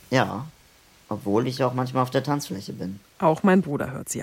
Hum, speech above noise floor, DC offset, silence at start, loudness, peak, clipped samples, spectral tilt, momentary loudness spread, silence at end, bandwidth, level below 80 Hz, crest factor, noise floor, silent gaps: none; 31 dB; under 0.1%; 0.1 s; -25 LUFS; -6 dBFS; under 0.1%; -6 dB/octave; 15 LU; 0 s; 16.5 kHz; -60 dBFS; 20 dB; -55 dBFS; none